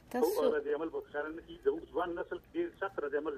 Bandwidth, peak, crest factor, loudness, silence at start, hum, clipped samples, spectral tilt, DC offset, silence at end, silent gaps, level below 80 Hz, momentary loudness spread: 15 kHz; -18 dBFS; 16 dB; -36 LUFS; 0.1 s; none; under 0.1%; -4.5 dB/octave; under 0.1%; 0 s; none; -64 dBFS; 9 LU